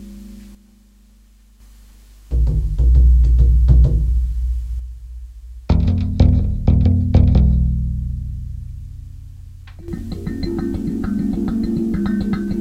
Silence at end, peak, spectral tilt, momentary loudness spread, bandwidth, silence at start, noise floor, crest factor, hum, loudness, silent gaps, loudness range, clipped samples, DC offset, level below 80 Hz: 0 s; 0 dBFS; -9.5 dB/octave; 23 LU; 5.2 kHz; 0 s; -49 dBFS; 16 dB; none; -18 LUFS; none; 8 LU; under 0.1%; under 0.1%; -18 dBFS